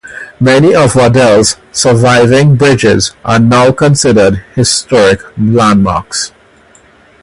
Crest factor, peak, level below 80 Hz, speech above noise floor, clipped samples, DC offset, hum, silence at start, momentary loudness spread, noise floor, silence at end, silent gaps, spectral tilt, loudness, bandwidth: 8 dB; 0 dBFS; -34 dBFS; 35 dB; 0.2%; under 0.1%; none; 0.05 s; 7 LU; -42 dBFS; 0.95 s; none; -5 dB/octave; -8 LUFS; 11.5 kHz